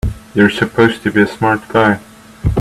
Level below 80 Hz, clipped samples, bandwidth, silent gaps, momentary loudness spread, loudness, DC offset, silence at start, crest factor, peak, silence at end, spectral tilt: -28 dBFS; under 0.1%; 13.5 kHz; none; 7 LU; -14 LUFS; under 0.1%; 0.05 s; 14 dB; 0 dBFS; 0 s; -6.5 dB/octave